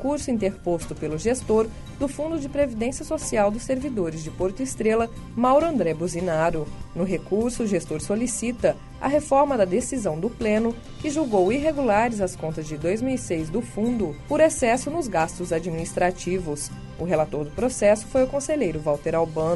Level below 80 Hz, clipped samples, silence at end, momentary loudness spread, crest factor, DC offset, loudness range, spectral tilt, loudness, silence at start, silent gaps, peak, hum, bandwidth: -42 dBFS; under 0.1%; 0 s; 8 LU; 16 dB; under 0.1%; 2 LU; -5.5 dB/octave; -24 LUFS; 0 s; none; -6 dBFS; none; 11.5 kHz